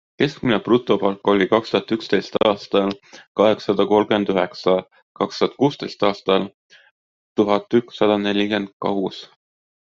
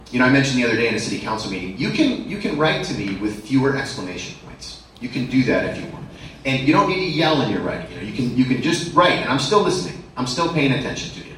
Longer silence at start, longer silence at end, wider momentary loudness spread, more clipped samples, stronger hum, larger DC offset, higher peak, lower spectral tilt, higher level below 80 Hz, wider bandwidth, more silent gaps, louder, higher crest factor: first, 0.2 s vs 0 s; first, 0.6 s vs 0 s; second, 8 LU vs 14 LU; neither; neither; neither; about the same, -2 dBFS vs -2 dBFS; first, -6.5 dB/octave vs -5 dB/octave; second, -58 dBFS vs -46 dBFS; second, 7.4 kHz vs 12 kHz; first, 3.27-3.35 s, 5.03-5.15 s, 6.54-6.70 s, 6.91-7.36 s, 8.73-8.80 s vs none; about the same, -20 LUFS vs -20 LUFS; about the same, 18 dB vs 20 dB